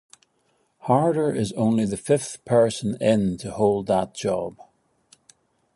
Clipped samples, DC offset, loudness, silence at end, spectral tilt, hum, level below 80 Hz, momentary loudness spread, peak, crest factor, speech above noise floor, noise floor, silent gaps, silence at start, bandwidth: under 0.1%; under 0.1%; -23 LUFS; 1.25 s; -6 dB/octave; none; -56 dBFS; 6 LU; -6 dBFS; 18 dB; 46 dB; -68 dBFS; none; 0.85 s; 11.5 kHz